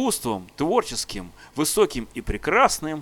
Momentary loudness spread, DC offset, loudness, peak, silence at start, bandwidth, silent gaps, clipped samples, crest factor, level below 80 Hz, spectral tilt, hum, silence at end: 13 LU; under 0.1%; -23 LUFS; -4 dBFS; 0 s; 18.5 kHz; none; under 0.1%; 20 dB; -40 dBFS; -3.5 dB/octave; none; 0 s